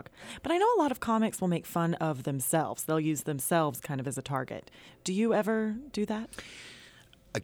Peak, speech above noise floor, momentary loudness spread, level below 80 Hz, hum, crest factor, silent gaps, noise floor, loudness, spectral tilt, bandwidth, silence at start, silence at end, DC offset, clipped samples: -14 dBFS; 26 dB; 16 LU; -64 dBFS; none; 16 dB; none; -57 dBFS; -30 LUFS; -5 dB/octave; over 20 kHz; 0.15 s; 0 s; under 0.1%; under 0.1%